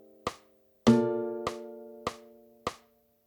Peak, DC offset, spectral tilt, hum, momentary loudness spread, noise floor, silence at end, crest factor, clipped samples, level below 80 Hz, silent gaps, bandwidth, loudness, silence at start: -8 dBFS; under 0.1%; -6 dB/octave; none; 18 LU; -64 dBFS; 0.5 s; 24 dB; under 0.1%; -60 dBFS; none; 19 kHz; -31 LUFS; 0.25 s